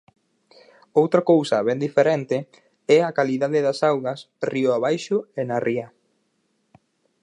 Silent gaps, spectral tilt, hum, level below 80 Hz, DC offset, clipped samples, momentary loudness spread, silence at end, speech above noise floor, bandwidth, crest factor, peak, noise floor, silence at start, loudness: none; -6 dB/octave; none; -74 dBFS; under 0.1%; under 0.1%; 10 LU; 1.35 s; 49 dB; 11 kHz; 20 dB; -4 dBFS; -70 dBFS; 0.95 s; -21 LUFS